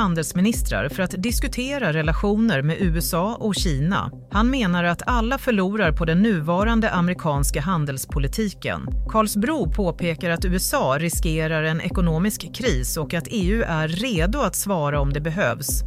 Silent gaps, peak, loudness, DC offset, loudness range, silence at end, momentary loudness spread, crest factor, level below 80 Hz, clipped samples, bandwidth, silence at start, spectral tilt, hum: none; -6 dBFS; -22 LUFS; under 0.1%; 2 LU; 0 s; 5 LU; 16 dB; -30 dBFS; under 0.1%; 16 kHz; 0 s; -5 dB/octave; none